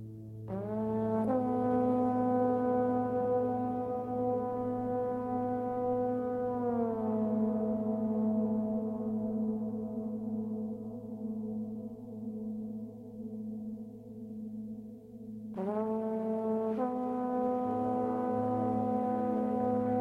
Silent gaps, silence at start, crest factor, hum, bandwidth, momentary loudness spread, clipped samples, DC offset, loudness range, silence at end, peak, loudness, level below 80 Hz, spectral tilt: none; 0 s; 14 dB; none; 3.7 kHz; 13 LU; under 0.1%; under 0.1%; 10 LU; 0 s; -18 dBFS; -33 LUFS; -66 dBFS; -10.5 dB/octave